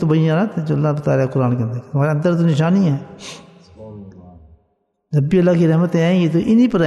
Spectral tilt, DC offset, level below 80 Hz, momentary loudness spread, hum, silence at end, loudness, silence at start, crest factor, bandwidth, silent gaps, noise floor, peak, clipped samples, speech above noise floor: -8.5 dB/octave; under 0.1%; -52 dBFS; 19 LU; none; 0 s; -16 LUFS; 0 s; 14 dB; 8.2 kHz; none; -66 dBFS; -2 dBFS; under 0.1%; 50 dB